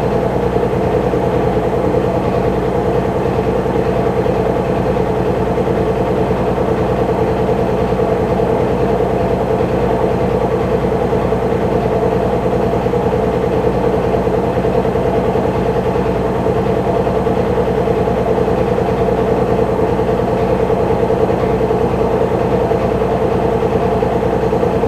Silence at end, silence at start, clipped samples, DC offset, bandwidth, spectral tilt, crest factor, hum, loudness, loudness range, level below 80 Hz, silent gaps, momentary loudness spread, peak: 0 s; 0 s; under 0.1%; under 0.1%; 13.5 kHz; -8 dB/octave; 14 dB; 60 Hz at -30 dBFS; -15 LUFS; 1 LU; -28 dBFS; none; 1 LU; -2 dBFS